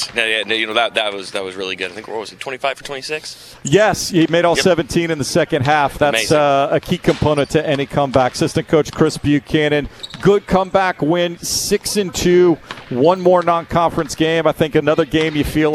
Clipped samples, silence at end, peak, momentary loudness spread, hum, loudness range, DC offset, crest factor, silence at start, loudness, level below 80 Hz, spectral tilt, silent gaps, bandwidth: under 0.1%; 0 s; 0 dBFS; 10 LU; none; 4 LU; under 0.1%; 16 dB; 0 s; -16 LUFS; -40 dBFS; -4.5 dB/octave; none; 14 kHz